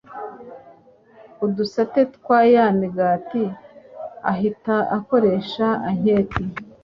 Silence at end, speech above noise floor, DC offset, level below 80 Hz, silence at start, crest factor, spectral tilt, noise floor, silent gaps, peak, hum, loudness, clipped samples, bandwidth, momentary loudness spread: 0.2 s; 31 dB; under 0.1%; -50 dBFS; 0.1 s; 18 dB; -8 dB/octave; -50 dBFS; none; -2 dBFS; none; -20 LUFS; under 0.1%; 7 kHz; 19 LU